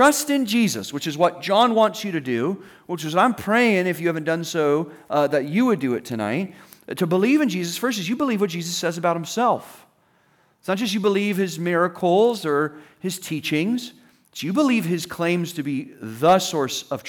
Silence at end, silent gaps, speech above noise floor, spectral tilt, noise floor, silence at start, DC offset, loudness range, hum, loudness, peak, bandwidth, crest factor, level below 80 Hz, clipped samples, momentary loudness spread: 0 s; none; 40 dB; -4.5 dB/octave; -61 dBFS; 0 s; under 0.1%; 3 LU; none; -22 LUFS; -6 dBFS; over 20 kHz; 16 dB; -70 dBFS; under 0.1%; 10 LU